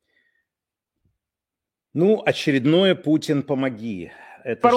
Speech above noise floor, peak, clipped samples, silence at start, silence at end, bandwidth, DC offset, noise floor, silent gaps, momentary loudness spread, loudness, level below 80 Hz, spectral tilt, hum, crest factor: 67 dB; -2 dBFS; under 0.1%; 1.95 s; 0 s; 13 kHz; under 0.1%; -87 dBFS; none; 15 LU; -21 LUFS; -68 dBFS; -6.5 dB/octave; none; 22 dB